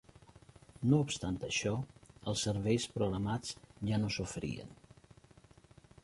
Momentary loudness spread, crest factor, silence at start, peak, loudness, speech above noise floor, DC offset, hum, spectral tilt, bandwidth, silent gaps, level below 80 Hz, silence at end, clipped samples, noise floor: 13 LU; 20 dB; 0.35 s; -16 dBFS; -36 LUFS; 27 dB; under 0.1%; none; -5 dB/octave; 11.5 kHz; none; -58 dBFS; 1.3 s; under 0.1%; -61 dBFS